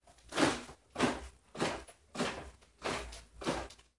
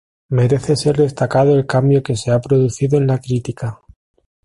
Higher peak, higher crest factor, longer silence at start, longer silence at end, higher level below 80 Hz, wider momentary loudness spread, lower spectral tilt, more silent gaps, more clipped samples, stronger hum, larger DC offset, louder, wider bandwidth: second, -16 dBFS vs -2 dBFS; first, 22 dB vs 14 dB; second, 0.05 s vs 0.3 s; second, 0.25 s vs 0.7 s; second, -56 dBFS vs -46 dBFS; first, 15 LU vs 8 LU; second, -3.5 dB/octave vs -7 dB/octave; neither; neither; neither; neither; second, -37 LUFS vs -16 LUFS; about the same, 11.5 kHz vs 11.5 kHz